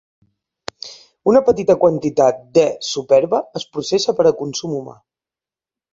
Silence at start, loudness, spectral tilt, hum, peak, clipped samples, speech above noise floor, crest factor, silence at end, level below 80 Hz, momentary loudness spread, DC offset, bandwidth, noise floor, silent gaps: 0.85 s; -17 LUFS; -5 dB/octave; none; 0 dBFS; under 0.1%; 74 dB; 18 dB; 1.05 s; -56 dBFS; 19 LU; under 0.1%; 7.8 kHz; -90 dBFS; none